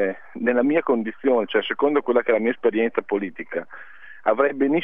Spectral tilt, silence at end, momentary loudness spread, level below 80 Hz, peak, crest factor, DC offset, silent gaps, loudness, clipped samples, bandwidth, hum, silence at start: -8.5 dB/octave; 0 s; 11 LU; -72 dBFS; -4 dBFS; 18 dB; 0.7%; none; -22 LUFS; under 0.1%; 3.8 kHz; none; 0 s